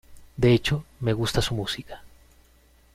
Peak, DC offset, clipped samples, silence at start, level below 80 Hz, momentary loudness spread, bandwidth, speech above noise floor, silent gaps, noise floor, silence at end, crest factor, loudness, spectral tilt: -8 dBFS; under 0.1%; under 0.1%; 0.1 s; -42 dBFS; 23 LU; 15.5 kHz; 34 dB; none; -58 dBFS; 0.85 s; 18 dB; -25 LUFS; -5.5 dB/octave